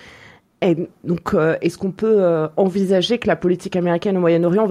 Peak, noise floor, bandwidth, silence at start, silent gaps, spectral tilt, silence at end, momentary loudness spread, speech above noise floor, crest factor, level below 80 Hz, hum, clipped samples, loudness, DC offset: -4 dBFS; -46 dBFS; 13 kHz; 0.6 s; none; -7 dB/octave; 0 s; 6 LU; 29 dB; 14 dB; -52 dBFS; none; under 0.1%; -18 LUFS; under 0.1%